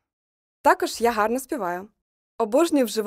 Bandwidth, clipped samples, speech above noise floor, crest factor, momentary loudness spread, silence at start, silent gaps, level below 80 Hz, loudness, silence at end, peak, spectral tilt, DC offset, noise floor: 16 kHz; under 0.1%; over 68 dB; 20 dB; 9 LU; 0.65 s; 2.02-2.39 s; -60 dBFS; -23 LUFS; 0 s; -4 dBFS; -3.5 dB/octave; under 0.1%; under -90 dBFS